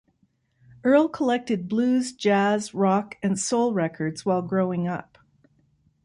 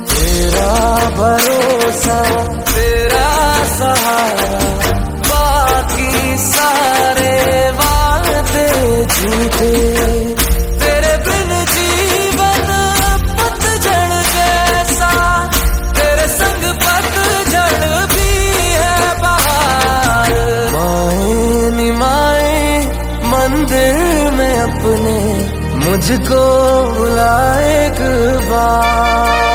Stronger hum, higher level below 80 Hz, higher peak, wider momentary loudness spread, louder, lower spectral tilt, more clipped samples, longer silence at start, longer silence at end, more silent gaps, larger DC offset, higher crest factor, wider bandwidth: neither; second, -66 dBFS vs -20 dBFS; second, -8 dBFS vs 0 dBFS; first, 8 LU vs 3 LU; second, -24 LUFS vs -12 LUFS; first, -5.5 dB/octave vs -4 dB/octave; neither; first, 0.85 s vs 0 s; first, 1 s vs 0 s; neither; neither; about the same, 16 dB vs 12 dB; second, 11.5 kHz vs 19.5 kHz